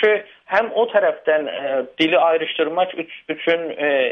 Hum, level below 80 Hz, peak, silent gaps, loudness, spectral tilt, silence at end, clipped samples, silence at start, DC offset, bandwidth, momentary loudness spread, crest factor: none; -68 dBFS; -4 dBFS; none; -19 LUFS; -5.5 dB/octave; 0 s; under 0.1%; 0 s; under 0.1%; 6.6 kHz; 7 LU; 16 dB